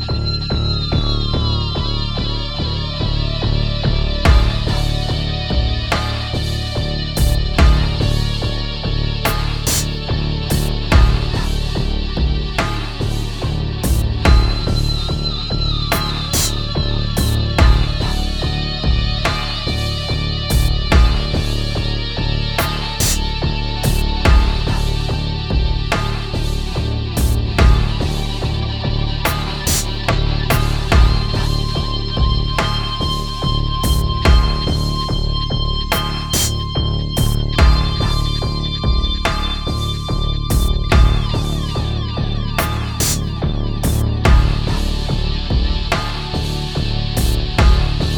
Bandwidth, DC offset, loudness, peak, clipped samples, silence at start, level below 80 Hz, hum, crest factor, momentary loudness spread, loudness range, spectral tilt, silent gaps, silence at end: over 20 kHz; under 0.1%; -18 LUFS; 0 dBFS; under 0.1%; 0 s; -18 dBFS; none; 16 dB; 7 LU; 1 LU; -4.5 dB/octave; none; 0 s